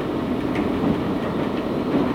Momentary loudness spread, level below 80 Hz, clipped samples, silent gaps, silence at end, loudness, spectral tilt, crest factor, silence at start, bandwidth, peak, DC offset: 2 LU; -42 dBFS; under 0.1%; none; 0 s; -23 LUFS; -7.5 dB/octave; 14 dB; 0 s; 16.5 kHz; -8 dBFS; under 0.1%